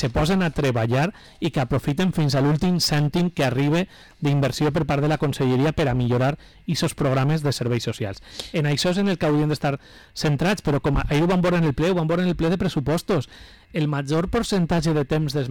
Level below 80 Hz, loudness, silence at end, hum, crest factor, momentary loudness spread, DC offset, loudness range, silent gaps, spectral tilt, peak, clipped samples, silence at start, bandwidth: -40 dBFS; -22 LUFS; 0 s; none; 6 dB; 7 LU; 0.2%; 2 LU; none; -6 dB/octave; -14 dBFS; under 0.1%; 0 s; 18 kHz